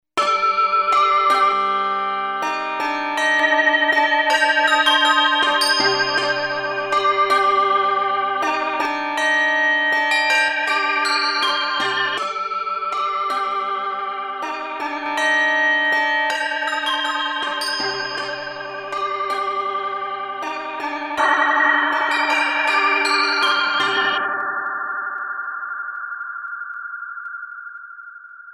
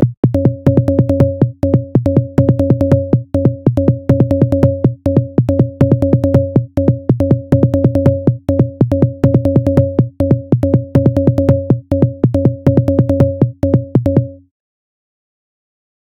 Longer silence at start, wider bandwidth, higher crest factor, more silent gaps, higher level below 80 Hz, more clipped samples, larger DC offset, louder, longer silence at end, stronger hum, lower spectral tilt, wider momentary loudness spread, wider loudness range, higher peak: first, 0.15 s vs 0 s; first, 15.5 kHz vs 5.8 kHz; about the same, 16 dB vs 12 dB; second, none vs 0.17-0.23 s; second, -64 dBFS vs -34 dBFS; second, under 0.1% vs 0.2%; second, under 0.1% vs 0.1%; second, -18 LUFS vs -13 LUFS; second, 0 s vs 1.75 s; neither; second, -1 dB/octave vs -11 dB/octave; first, 12 LU vs 3 LU; first, 8 LU vs 1 LU; second, -4 dBFS vs 0 dBFS